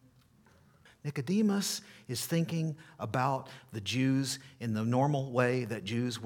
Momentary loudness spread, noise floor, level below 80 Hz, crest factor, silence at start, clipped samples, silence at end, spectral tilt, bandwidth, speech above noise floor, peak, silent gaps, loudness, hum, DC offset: 10 LU; -63 dBFS; -74 dBFS; 18 dB; 1.05 s; under 0.1%; 0 s; -5.5 dB/octave; 19 kHz; 31 dB; -14 dBFS; none; -32 LUFS; none; under 0.1%